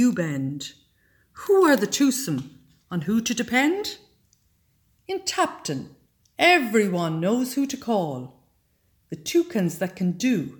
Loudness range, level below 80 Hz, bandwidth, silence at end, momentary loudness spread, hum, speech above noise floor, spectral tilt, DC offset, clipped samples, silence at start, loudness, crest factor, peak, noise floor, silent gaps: 4 LU; -64 dBFS; 19 kHz; 0.05 s; 18 LU; none; 43 dB; -4.5 dB/octave; under 0.1%; under 0.1%; 0 s; -23 LUFS; 20 dB; -6 dBFS; -66 dBFS; none